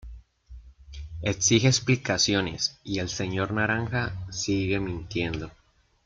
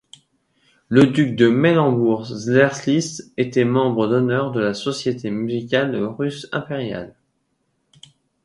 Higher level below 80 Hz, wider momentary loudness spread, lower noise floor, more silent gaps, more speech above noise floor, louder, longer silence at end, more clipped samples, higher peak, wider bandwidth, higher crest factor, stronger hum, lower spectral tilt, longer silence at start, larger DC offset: first, -48 dBFS vs -58 dBFS; about the same, 12 LU vs 11 LU; second, -48 dBFS vs -69 dBFS; neither; second, 22 dB vs 51 dB; second, -26 LUFS vs -19 LUFS; second, 0.55 s vs 1.35 s; neither; second, -6 dBFS vs 0 dBFS; second, 9.4 kHz vs 11.5 kHz; about the same, 20 dB vs 20 dB; neither; second, -4 dB/octave vs -6 dB/octave; second, 0.05 s vs 0.9 s; neither